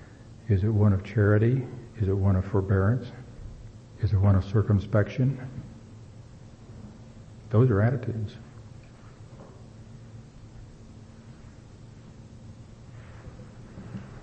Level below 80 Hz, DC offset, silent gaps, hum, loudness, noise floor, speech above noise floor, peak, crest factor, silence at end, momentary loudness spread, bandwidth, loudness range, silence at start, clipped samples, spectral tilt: -50 dBFS; under 0.1%; none; none; -25 LUFS; -47 dBFS; 24 dB; -10 dBFS; 18 dB; 0 s; 25 LU; 6.6 kHz; 22 LU; 0 s; under 0.1%; -9.5 dB/octave